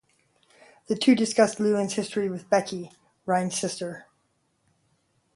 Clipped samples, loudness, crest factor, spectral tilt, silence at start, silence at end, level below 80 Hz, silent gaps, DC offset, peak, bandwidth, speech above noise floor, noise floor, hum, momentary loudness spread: under 0.1%; -25 LUFS; 20 dB; -4.5 dB/octave; 0.9 s; 1.35 s; -72 dBFS; none; under 0.1%; -6 dBFS; 11.5 kHz; 47 dB; -71 dBFS; none; 16 LU